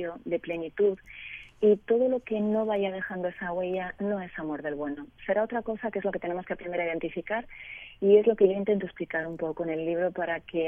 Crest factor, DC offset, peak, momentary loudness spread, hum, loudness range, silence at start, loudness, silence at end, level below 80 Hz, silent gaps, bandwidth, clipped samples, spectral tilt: 20 dB; under 0.1%; -10 dBFS; 12 LU; none; 5 LU; 0 s; -29 LUFS; 0 s; -60 dBFS; none; 3.6 kHz; under 0.1%; -9 dB/octave